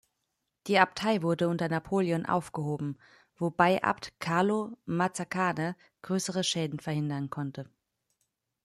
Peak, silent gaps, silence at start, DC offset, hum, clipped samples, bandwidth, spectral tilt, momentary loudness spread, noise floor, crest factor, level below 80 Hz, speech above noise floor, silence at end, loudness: -6 dBFS; none; 0.65 s; under 0.1%; none; under 0.1%; 13.5 kHz; -5 dB/octave; 12 LU; -82 dBFS; 24 dB; -68 dBFS; 53 dB; 1 s; -30 LUFS